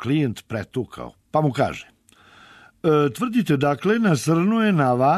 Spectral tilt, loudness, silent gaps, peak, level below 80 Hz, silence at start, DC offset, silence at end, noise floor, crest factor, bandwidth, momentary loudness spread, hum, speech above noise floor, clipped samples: -6.5 dB/octave; -21 LUFS; none; -8 dBFS; -58 dBFS; 0 s; under 0.1%; 0 s; -52 dBFS; 14 dB; 13.5 kHz; 11 LU; none; 32 dB; under 0.1%